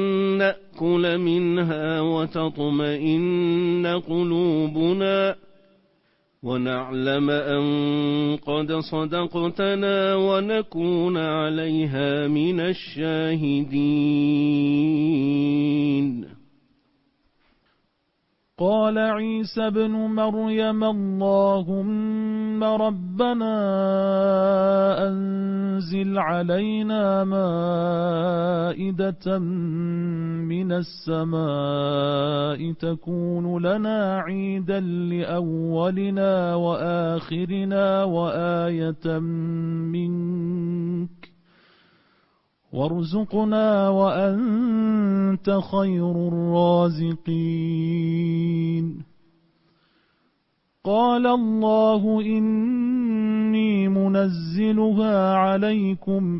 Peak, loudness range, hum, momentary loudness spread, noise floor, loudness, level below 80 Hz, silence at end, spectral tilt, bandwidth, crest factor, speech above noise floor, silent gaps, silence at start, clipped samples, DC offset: -8 dBFS; 5 LU; none; 6 LU; -71 dBFS; -23 LUFS; -60 dBFS; 0 s; -11.5 dB/octave; 5.8 kHz; 14 dB; 49 dB; none; 0 s; under 0.1%; under 0.1%